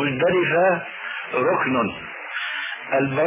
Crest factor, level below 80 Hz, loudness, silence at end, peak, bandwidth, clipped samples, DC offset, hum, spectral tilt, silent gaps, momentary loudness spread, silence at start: 14 dB; -58 dBFS; -22 LUFS; 0 s; -8 dBFS; 3.8 kHz; under 0.1%; under 0.1%; none; -9.5 dB/octave; none; 11 LU; 0 s